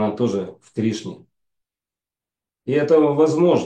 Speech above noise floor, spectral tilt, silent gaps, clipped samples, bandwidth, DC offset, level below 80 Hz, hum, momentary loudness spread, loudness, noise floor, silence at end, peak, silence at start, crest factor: over 71 dB; -7 dB/octave; none; under 0.1%; 9 kHz; under 0.1%; -68 dBFS; none; 15 LU; -19 LUFS; under -90 dBFS; 0 s; -4 dBFS; 0 s; 16 dB